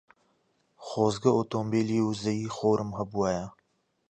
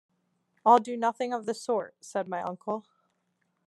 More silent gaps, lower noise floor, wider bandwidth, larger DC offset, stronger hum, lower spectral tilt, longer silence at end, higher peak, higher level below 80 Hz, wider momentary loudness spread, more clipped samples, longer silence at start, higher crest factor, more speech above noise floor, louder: neither; about the same, -74 dBFS vs -76 dBFS; second, 9.2 kHz vs 12 kHz; neither; neither; first, -6.5 dB/octave vs -5 dB/octave; second, 0.6 s vs 0.85 s; about the same, -8 dBFS vs -8 dBFS; first, -60 dBFS vs -88 dBFS; second, 9 LU vs 13 LU; neither; first, 0.8 s vs 0.65 s; about the same, 20 dB vs 22 dB; about the same, 47 dB vs 48 dB; about the same, -28 LUFS vs -29 LUFS